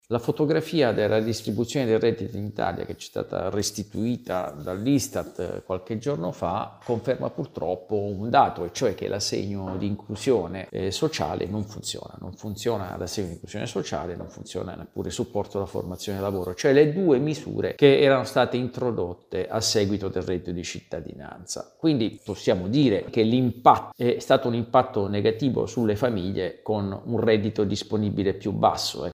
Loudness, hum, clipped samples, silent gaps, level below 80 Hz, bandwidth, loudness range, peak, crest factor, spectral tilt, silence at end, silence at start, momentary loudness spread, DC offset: -25 LUFS; none; under 0.1%; none; -56 dBFS; 16 kHz; 8 LU; -2 dBFS; 22 dB; -5.5 dB/octave; 0 s; 0.1 s; 12 LU; under 0.1%